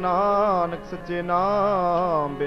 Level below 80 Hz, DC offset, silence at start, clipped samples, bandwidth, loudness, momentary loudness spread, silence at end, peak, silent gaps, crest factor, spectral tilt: -46 dBFS; under 0.1%; 0 s; under 0.1%; 6.8 kHz; -22 LUFS; 9 LU; 0 s; -10 dBFS; none; 12 dB; -7.5 dB/octave